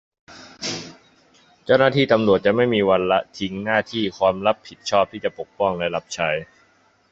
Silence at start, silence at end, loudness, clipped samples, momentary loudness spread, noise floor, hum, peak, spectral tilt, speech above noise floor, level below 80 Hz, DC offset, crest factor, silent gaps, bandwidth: 0.3 s; 0.65 s; -21 LUFS; under 0.1%; 12 LU; -59 dBFS; none; -2 dBFS; -5 dB/octave; 39 dB; -54 dBFS; under 0.1%; 20 dB; none; 7.8 kHz